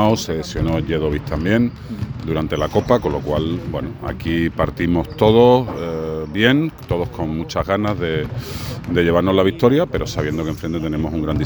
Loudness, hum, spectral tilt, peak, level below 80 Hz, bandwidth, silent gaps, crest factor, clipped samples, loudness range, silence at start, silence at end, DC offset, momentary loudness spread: -19 LUFS; none; -6.5 dB/octave; 0 dBFS; -34 dBFS; over 20 kHz; none; 18 dB; under 0.1%; 3 LU; 0 s; 0 s; under 0.1%; 10 LU